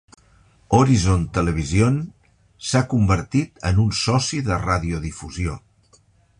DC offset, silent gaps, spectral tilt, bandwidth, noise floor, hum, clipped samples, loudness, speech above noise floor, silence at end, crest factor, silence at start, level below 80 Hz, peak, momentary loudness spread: under 0.1%; none; -5.5 dB/octave; 11 kHz; -57 dBFS; none; under 0.1%; -21 LUFS; 37 dB; 0.8 s; 18 dB; 0.7 s; -34 dBFS; -2 dBFS; 11 LU